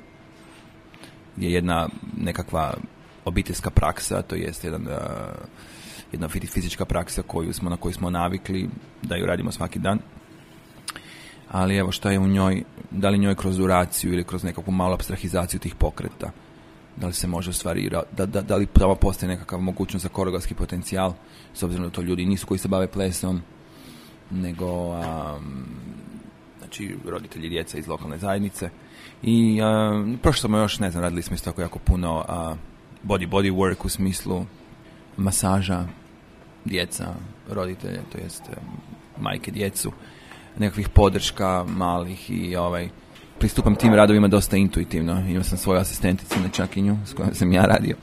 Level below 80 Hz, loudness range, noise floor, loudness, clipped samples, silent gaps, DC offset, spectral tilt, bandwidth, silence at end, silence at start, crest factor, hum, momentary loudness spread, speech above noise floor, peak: -34 dBFS; 10 LU; -48 dBFS; -24 LUFS; under 0.1%; none; under 0.1%; -5.5 dB/octave; 15.5 kHz; 0 s; 0 s; 24 dB; none; 16 LU; 25 dB; 0 dBFS